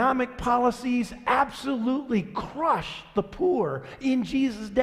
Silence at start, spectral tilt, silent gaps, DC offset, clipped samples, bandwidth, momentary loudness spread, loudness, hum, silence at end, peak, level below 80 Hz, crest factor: 0 s; -6 dB/octave; none; under 0.1%; under 0.1%; 13.5 kHz; 6 LU; -26 LUFS; none; 0 s; -8 dBFS; -50 dBFS; 18 dB